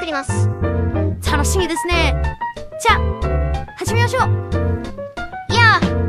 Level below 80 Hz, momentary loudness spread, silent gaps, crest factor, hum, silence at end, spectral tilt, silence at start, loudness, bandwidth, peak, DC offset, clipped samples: -24 dBFS; 13 LU; none; 18 dB; none; 0 s; -5 dB/octave; 0 s; -18 LUFS; 14.5 kHz; 0 dBFS; under 0.1%; under 0.1%